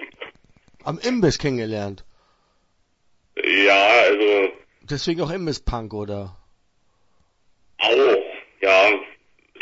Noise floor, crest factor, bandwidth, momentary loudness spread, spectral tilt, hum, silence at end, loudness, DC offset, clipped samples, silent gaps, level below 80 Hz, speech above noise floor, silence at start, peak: -65 dBFS; 18 dB; 8 kHz; 20 LU; -4.5 dB/octave; none; 0.55 s; -19 LUFS; under 0.1%; under 0.1%; none; -44 dBFS; 45 dB; 0 s; -4 dBFS